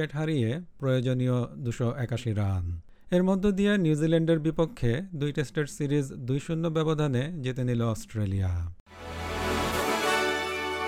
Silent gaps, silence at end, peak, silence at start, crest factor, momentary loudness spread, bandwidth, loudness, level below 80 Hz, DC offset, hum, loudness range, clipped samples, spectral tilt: 8.80-8.86 s; 0 s; -12 dBFS; 0 s; 16 dB; 8 LU; 16.5 kHz; -28 LUFS; -46 dBFS; under 0.1%; none; 3 LU; under 0.1%; -6.5 dB/octave